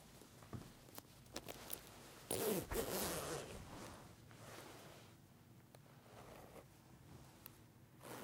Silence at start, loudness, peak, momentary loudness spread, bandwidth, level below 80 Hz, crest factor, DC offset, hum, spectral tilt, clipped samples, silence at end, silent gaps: 0 s; -48 LUFS; -24 dBFS; 22 LU; 17.5 kHz; -66 dBFS; 26 dB; under 0.1%; none; -3.5 dB/octave; under 0.1%; 0 s; none